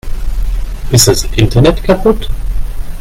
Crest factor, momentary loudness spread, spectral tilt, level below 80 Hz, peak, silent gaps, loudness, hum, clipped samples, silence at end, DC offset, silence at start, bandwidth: 10 dB; 15 LU; -4.5 dB/octave; -16 dBFS; 0 dBFS; none; -11 LUFS; none; 0.2%; 0 s; under 0.1%; 0.05 s; 17 kHz